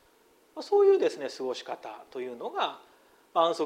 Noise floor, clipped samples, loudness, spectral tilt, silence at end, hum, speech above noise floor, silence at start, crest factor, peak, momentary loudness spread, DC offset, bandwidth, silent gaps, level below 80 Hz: -63 dBFS; under 0.1%; -28 LUFS; -4 dB/octave; 0 s; none; 35 dB; 0.55 s; 18 dB; -10 dBFS; 19 LU; under 0.1%; 10.5 kHz; none; -80 dBFS